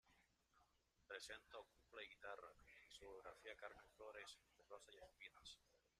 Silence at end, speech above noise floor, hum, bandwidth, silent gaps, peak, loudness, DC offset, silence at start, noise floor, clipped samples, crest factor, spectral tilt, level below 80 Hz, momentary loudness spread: 0.1 s; 20 dB; none; 13.5 kHz; none; -40 dBFS; -60 LUFS; under 0.1%; 0.05 s; -82 dBFS; under 0.1%; 22 dB; -1.5 dB/octave; -82 dBFS; 8 LU